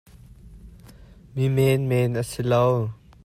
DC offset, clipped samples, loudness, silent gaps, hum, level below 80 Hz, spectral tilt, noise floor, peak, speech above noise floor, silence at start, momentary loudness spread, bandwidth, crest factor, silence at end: under 0.1%; under 0.1%; -22 LUFS; none; none; -50 dBFS; -7 dB/octave; -47 dBFS; -8 dBFS; 26 dB; 0.45 s; 8 LU; 15.5 kHz; 16 dB; 0.3 s